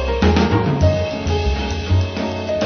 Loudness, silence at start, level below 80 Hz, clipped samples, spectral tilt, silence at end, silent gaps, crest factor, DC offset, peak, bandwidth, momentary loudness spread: -18 LUFS; 0 s; -24 dBFS; under 0.1%; -6.5 dB/octave; 0 s; none; 14 dB; under 0.1%; -4 dBFS; 6.6 kHz; 7 LU